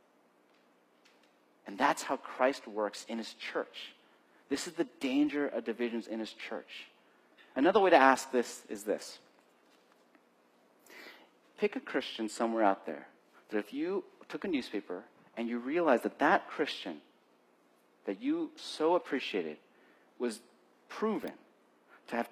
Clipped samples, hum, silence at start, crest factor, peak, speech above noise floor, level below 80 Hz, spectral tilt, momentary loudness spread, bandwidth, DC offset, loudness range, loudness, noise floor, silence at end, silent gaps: under 0.1%; 60 Hz at -70 dBFS; 1.65 s; 26 dB; -8 dBFS; 35 dB; -82 dBFS; -4 dB/octave; 19 LU; 15 kHz; under 0.1%; 8 LU; -33 LUFS; -68 dBFS; 0 s; none